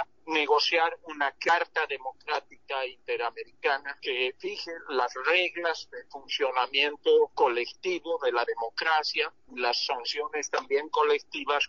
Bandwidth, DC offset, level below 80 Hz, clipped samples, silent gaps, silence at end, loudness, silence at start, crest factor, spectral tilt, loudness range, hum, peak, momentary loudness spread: 7.4 kHz; 0.1%; -74 dBFS; under 0.1%; none; 0 s; -28 LUFS; 0 s; 18 dB; 2.5 dB/octave; 3 LU; none; -10 dBFS; 9 LU